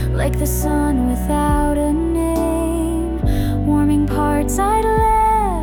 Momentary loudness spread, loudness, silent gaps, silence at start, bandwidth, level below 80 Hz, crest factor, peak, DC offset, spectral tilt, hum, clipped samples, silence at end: 4 LU; -18 LUFS; none; 0 s; 18.5 kHz; -22 dBFS; 12 dB; -6 dBFS; under 0.1%; -6.5 dB/octave; none; under 0.1%; 0 s